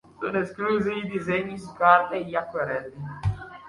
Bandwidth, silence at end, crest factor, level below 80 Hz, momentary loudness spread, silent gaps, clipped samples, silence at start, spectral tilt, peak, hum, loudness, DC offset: 11.5 kHz; 0 s; 22 dB; -48 dBFS; 12 LU; none; under 0.1%; 0.2 s; -7 dB/octave; -4 dBFS; none; -25 LUFS; under 0.1%